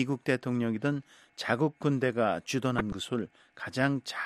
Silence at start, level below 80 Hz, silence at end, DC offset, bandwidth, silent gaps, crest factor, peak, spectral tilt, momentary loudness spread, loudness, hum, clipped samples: 0 s; -58 dBFS; 0 s; under 0.1%; 13.5 kHz; none; 20 dB; -10 dBFS; -6 dB/octave; 9 LU; -31 LUFS; none; under 0.1%